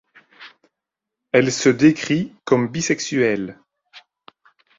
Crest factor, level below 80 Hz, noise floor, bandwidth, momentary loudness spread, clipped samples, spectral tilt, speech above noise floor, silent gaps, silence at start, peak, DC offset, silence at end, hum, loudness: 20 dB; -60 dBFS; -84 dBFS; 7.8 kHz; 8 LU; under 0.1%; -5 dB/octave; 66 dB; none; 0.4 s; -2 dBFS; under 0.1%; 0.8 s; none; -19 LUFS